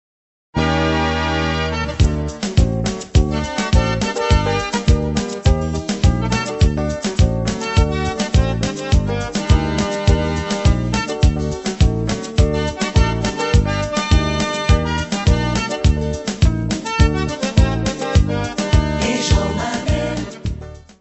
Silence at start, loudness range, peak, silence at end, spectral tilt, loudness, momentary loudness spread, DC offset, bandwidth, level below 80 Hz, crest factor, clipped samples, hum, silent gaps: 0.55 s; 1 LU; 0 dBFS; 0.2 s; -5.5 dB/octave; -18 LUFS; 5 LU; under 0.1%; 8.4 kHz; -22 dBFS; 16 dB; under 0.1%; none; none